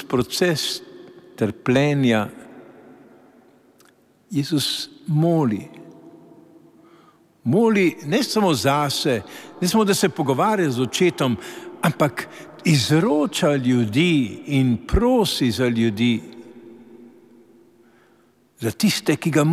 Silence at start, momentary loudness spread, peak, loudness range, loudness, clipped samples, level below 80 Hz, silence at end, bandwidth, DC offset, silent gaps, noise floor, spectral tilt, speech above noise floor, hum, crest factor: 0 s; 10 LU; -4 dBFS; 6 LU; -20 LUFS; under 0.1%; -42 dBFS; 0 s; 16 kHz; under 0.1%; none; -58 dBFS; -5.5 dB/octave; 38 dB; none; 18 dB